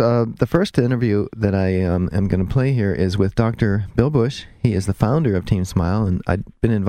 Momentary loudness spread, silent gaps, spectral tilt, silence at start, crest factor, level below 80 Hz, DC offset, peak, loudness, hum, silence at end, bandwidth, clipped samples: 3 LU; none; -8 dB/octave; 0 s; 16 dB; -36 dBFS; under 0.1%; -2 dBFS; -19 LUFS; none; 0 s; 13.5 kHz; under 0.1%